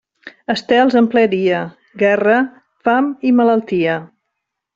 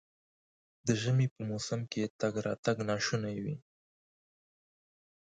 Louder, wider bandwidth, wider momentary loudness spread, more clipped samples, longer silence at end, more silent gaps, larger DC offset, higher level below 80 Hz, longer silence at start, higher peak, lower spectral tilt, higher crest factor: first, -15 LUFS vs -34 LUFS; second, 7.4 kHz vs 9.2 kHz; about the same, 10 LU vs 8 LU; neither; second, 0.7 s vs 1.65 s; second, none vs 1.31-1.36 s, 2.10-2.19 s, 2.58-2.63 s; neither; first, -60 dBFS vs -68 dBFS; second, 0.25 s vs 0.85 s; first, -2 dBFS vs -14 dBFS; about the same, -6.5 dB/octave vs -5.5 dB/octave; second, 14 dB vs 20 dB